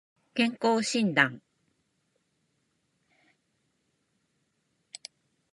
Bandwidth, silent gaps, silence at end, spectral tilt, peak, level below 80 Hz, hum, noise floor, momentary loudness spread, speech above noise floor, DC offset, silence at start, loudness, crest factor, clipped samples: 11.5 kHz; none; 4.15 s; -4 dB/octave; -8 dBFS; -84 dBFS; none; -76 dBFS; 22 LU; 50 dB; under 0.1%; 0.35 s; -27 LUFS; 26 dB; under 0.1%